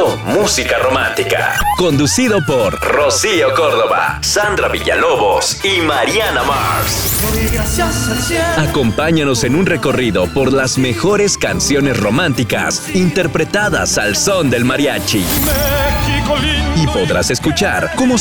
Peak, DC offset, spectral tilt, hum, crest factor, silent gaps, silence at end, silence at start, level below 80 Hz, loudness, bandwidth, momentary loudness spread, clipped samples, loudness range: -4 dBFS; 0.3%; -4 dB/octave; none; 10 dB; none; 0 s; 0 s; -28 dBFS; -13 LUFS; over 20 kHz; 3 LU; under 0.1%; 1 LU